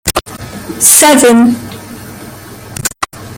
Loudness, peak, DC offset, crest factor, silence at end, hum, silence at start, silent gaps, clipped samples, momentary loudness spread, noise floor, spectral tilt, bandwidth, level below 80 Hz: -8 LUFS; 0 dBFS; under 0.1%; 12 dB; 0 s; none; 0.05 s; none; 0.6%; 25 LU; -29 dBFS; -2.5 dB/octave; over 20 kHz; -38 dBFS